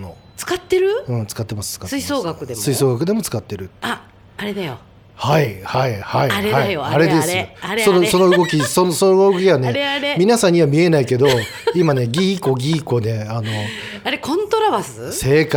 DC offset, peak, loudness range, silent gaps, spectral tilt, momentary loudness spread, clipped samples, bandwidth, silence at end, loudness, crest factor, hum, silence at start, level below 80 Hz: under 0.1%; -2 dBFS; 7 LU; none; -5 dB/octave; 12 LU; under 0.1%; over 20 kHz; 0 s; -17 LUFS; 14 dB; none; 0 s; -48 dBFS